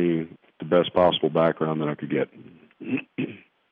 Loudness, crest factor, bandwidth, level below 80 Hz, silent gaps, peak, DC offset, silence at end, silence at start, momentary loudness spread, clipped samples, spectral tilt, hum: -24 LUFS; 18 dB; 4.9 kHz; -62 dBFS; none; -8 dBFS; under 0.1%; 0.35 s; 0 s; 13 LU; under 0.1%; -9 dB/octave; none